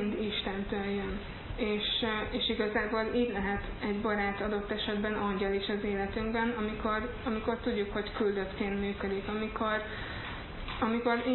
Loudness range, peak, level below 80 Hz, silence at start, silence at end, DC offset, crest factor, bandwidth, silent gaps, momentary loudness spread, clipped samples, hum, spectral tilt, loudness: 2 LU; -16 dBFS; -46 dBFS; 0 s; 0 s; under 0.1%; 16 dB; 4.3 kHz; none; 6 LU; under 0.1%; none; -9 dB/octave; -33 LUFS